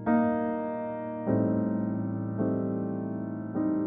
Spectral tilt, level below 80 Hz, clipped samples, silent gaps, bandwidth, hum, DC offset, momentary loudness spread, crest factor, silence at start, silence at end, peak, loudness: -10 dB/octave; -62 dBFS; under 0.1%; none; 3.7 kHz; none; under 0.1%; 8 LU; 14 dB; 0 s; 0 s; -14 dBFS; -30 LUFS